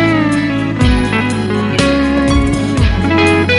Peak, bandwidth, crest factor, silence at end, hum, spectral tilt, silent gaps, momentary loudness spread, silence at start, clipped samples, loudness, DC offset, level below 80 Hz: 0 dBFS; 11.5 kHz; 12 dB; 0 s; none; -6 dB/octave; none; 4 LU; 0 s; under 0.1%; -13 LUFS; under 0.1%; -22 dBFS